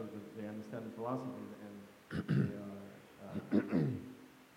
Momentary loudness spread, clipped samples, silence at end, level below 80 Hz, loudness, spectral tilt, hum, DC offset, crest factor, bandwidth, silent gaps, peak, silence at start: 18 LU; under 0.1%; 0 s; -74 dBFS; -40 LUFS; -8.5 dB/octave; none; under 0.1%; 22 dB; 16 kHz; none; -18 dBFS; 0 s